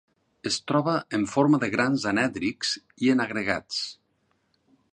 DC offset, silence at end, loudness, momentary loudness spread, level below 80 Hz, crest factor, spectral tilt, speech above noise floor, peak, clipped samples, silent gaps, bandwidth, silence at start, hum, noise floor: under 0.1%; 1 s; -25 LUFS; 8 LU; -62 dBFS; 20 dB; -4.5 dB/octave; 46 dB; -8 dBFS; under 0.1%; none; 10 kHz; 0.45 s; none; -71 dBFS